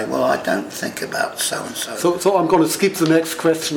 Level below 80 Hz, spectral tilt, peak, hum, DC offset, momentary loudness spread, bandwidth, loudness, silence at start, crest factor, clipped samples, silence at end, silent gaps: -58 dBFS; -4 dB/octave; -4 dBFS; none; under 0.1%; 9 LU; 19.5 kHz; -19 LUFS; 0 s; 14 dB; under 0.1%; 0 s; none